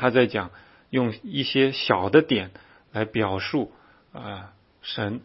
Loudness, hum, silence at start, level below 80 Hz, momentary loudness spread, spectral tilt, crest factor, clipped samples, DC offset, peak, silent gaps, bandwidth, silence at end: -24 LUFS; none; 0 s; -60 dBFS; 19 LU; -9.5 dB/octave; 22 dB; under 0.1%; under 0.1%; -4 dBFS; none; 5.8 kHz; 0.05 s